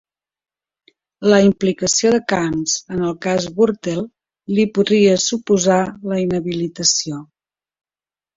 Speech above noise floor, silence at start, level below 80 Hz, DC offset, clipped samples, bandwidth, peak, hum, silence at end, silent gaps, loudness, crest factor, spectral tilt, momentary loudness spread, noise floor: over 73 dB; 1.2 s; -52 dBFS; under 0.1%; under 0.1%; 8 kHz; -2 dBFS; none; 1.1 s; none; -17 LUFS; 18 dB; -4 dB/octave; 10 LU; under -90 dBFS